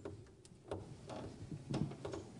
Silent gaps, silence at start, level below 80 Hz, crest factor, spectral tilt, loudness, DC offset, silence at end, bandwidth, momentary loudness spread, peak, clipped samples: none; 0 s; -66 dBFS; 22 dB; -7 dB/octave; -47 LUFS; under 0.1%; 0 s; 10.5 kHz; 15 LU; -26 dBFS; under 0.1%